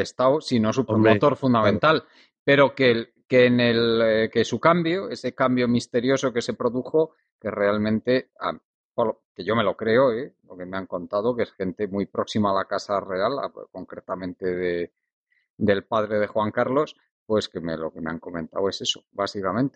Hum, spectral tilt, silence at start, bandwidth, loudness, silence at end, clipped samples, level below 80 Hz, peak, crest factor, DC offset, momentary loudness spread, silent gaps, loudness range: none; -6 dB/octave; 0 s; 9 kHz; -23 LUFS; 0.05 s; under 0.1%; -60 dBFS; -4 dBFS; 18 dB; under 0.1%; 13 LU; 2.39-2.46 s, 7.32-7.39 s, 8.65-8.90 s, 9.25-9.35 s, 15.13-15.27 s, 15.50-15.57 s, 17.11-17.26 s; 7 LU